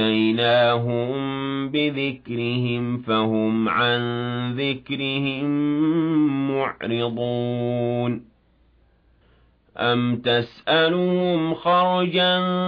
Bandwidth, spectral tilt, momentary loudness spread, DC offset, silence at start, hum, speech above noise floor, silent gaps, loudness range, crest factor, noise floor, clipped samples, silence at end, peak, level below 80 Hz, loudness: 5.2 kHz; -9 dB/octave; 7 LU; under 0.1%; 0 s; none; 38 dB; none; 5 LU; 14 dB; -59 dBFS; under 0.1%; 0 s; -8 dBFS; -60 dBFS; -22 LUFS